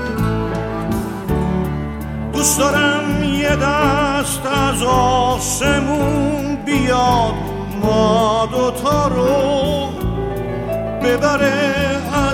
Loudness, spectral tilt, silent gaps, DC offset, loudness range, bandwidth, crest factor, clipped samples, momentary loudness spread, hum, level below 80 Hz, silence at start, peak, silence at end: -17 LUFS; -4.5 dB/octave; none; under 0.1%; 2 LU; 17 kHz; 16 dB; under 0.1%; 8 LU; none; -30 dBFS; 0 s; -2 dBFS; 0 s